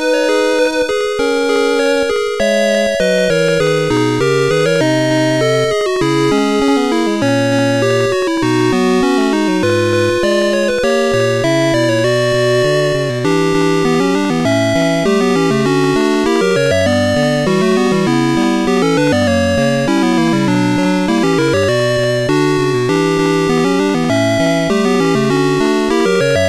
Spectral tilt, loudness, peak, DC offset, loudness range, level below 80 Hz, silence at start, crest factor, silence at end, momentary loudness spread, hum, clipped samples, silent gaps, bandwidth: -5.5 dB/octave; -13 LUFS; -4 dBFS; 1%; 0 LU; -42 dBFS; 0 s; 8 dB; 0 s; 1 LU; none; under 0.1%; none; 15 kHz